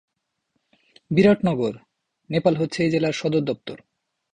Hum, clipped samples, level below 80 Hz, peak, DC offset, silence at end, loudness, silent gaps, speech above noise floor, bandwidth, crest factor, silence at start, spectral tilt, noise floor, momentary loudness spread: none; under 0.1%; -56 dBFS; -6 dBFS; under 0.1%; 0.6 s; -22 LUFS; none; 54 dB; 9.6 kHz; 18 dB; 1.1 s; -7 dB/octave; -75 dBFS; 16 LU